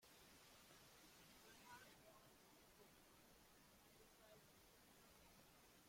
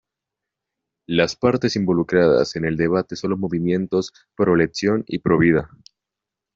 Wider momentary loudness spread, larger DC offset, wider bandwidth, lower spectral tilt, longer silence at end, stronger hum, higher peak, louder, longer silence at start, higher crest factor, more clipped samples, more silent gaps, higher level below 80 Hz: about the same, 6 LU vs 7 LU; neither; first, 16.5 kHz vs 7.8 kHz; second, -2.5 dB/octave vs -6.5 dB/octave; second, 0 s vs 0.9 s; neither; second, -50 dBFS vs -2 dBFS; second, -68 LUFS vs -20 LUFS; second, 0 s vs 1.1 s; about the same, 20 dB vs 18 dB; neither; neither; second, -84 dBFS vs -52 dBFS